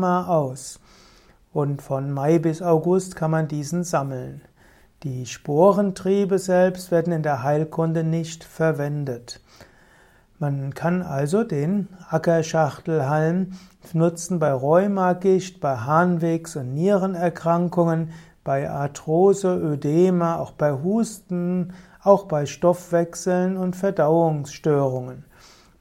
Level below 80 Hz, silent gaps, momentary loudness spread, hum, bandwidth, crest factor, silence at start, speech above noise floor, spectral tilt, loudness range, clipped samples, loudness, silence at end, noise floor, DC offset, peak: -58 dBFS; none; 11 LU; none; 15.5 kHz; 20 dB; 0 s; 33 dB; -7 dB/octave; 4 LU; under 0.1%; -22 LUFS; 0.6 s; -54 dBFS; under 0.1%; -2 dBFS